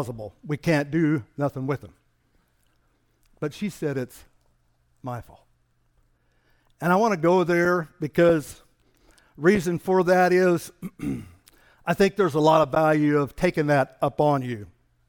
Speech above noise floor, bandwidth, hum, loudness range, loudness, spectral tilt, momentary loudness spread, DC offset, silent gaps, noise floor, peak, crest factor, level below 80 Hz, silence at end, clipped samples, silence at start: 44 dB; 19 kHz; none; 13 LU; -23 LUFS; -6.5 dB/octave; 16 LU; under 0.1%; none; -66 dBFS; -6 dBFS; 18 dB; -54 dBFS; 0.45 s; under 0.1%; 0 s